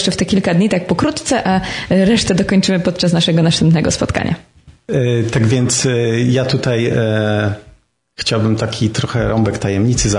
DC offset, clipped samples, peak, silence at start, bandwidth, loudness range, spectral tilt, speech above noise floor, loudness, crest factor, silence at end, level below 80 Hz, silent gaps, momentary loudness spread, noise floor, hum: under 0.1%; under 0.1%; -2 dBFS; 0 s; 11 kHz; 3 LU; -5 dB/octave; 34 dB; -15 LUFS; 12 dB; 0 s; -36 dBFS; none; 5 LU; -48 dBFS; none